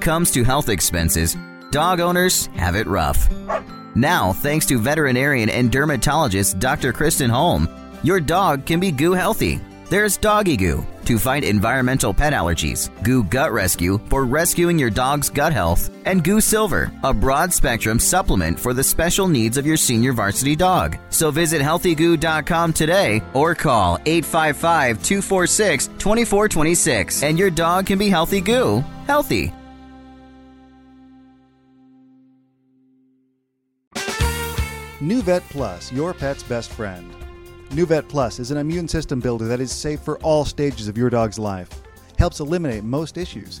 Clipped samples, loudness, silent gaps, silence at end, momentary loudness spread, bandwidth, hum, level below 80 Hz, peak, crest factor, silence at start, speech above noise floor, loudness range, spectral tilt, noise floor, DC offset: under 0.1%; -19 LUFS; 33.87-33.91 s; 0 s; 9 LU; 17 kHz; none; -32 dBFS; -2 dBFS; 16 dB; 0 s; 52 dB; 7 LU; -4.5 dB/octave; -70 dBFS; under 0.1%